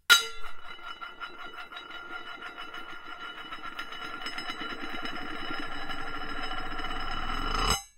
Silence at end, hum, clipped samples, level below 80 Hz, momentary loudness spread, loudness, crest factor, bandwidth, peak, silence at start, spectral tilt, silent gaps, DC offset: 0.1 s; none; under 0.1%; -40 dBFS; 12 LU; -34 LUFS; 30 dB; 16 kHz; -2 dBFS; 0.1 s; -1.5 dB/octave; none; under 0.1%